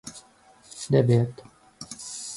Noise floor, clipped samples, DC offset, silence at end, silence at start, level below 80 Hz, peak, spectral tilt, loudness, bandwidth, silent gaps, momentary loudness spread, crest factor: -55 dBFS; under 0.1%; under 0.1%; 0 s; 0.05 s; -62 dBFS; -6 dBFS; -6.5 dB/octave; -24 LUFS; 11.5 kHz; none; 24 LU; 20 dB